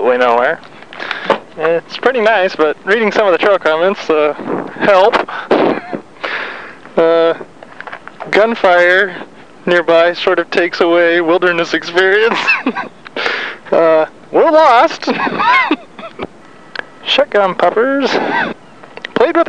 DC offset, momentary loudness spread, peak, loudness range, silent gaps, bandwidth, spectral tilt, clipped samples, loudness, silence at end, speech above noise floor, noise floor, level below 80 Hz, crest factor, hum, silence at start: 0.8%; 17 LU; 0 dBFS; 3 LU; none; 9.4 kHz; -4.5 dB/octave; under 0.1%; -12 LUFS; 0 s; 28 dB; -39 dBFS; -56 dBFS; 14 dB; none; 0 s